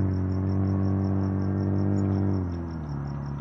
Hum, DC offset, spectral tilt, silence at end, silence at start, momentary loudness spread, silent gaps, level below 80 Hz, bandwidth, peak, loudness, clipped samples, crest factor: none; under 0.1%; -10.5 dB/octave; 0 s; 0 s; 8 LU; none; -48 dBFS; 6 kHz; -14 dBFS; -27 LUFS; under 0.1%; 12 dB